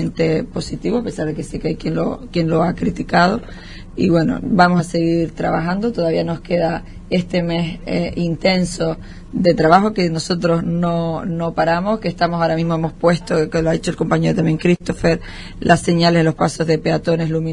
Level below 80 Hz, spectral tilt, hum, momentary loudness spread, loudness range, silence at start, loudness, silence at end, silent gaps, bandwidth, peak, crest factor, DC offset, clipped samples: -36 dBFS; -6.5 dB/octave; none; 9 LU; 3 LU; 0 s; -18 LUFS; 0 s; none; 11 kHz; 0 dBFS; 18 dB; under 0.1%; under 0.1%